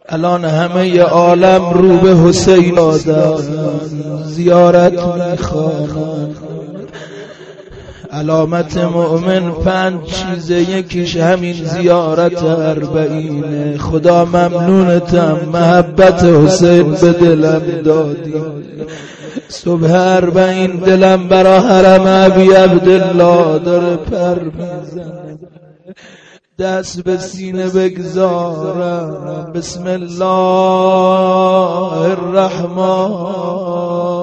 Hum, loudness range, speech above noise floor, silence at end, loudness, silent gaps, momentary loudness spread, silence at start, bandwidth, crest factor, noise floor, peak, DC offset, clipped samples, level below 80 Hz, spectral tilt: none; 10 LU; 22 dB; 0 s; -11 LUFS; none; 15 LU; 0.1 s; 8.6 kHz; 12 dB; -33 dBFS; 0 dBFS; under 0.1%; under 0.1%; -38 dBFS; -6.5 dB/octave